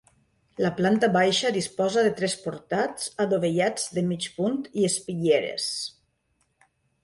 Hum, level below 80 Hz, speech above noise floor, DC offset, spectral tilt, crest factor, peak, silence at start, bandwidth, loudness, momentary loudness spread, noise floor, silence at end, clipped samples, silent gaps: none; -66 dBFS; 47 dB; under 0.1%; -4 dB/octave; 16 dB; -10 dBFS; 0.6 s; 11.5 kHz; -25 LUFS; 8 LU; -72 dBFS; 1.15 s; under 0.1%; none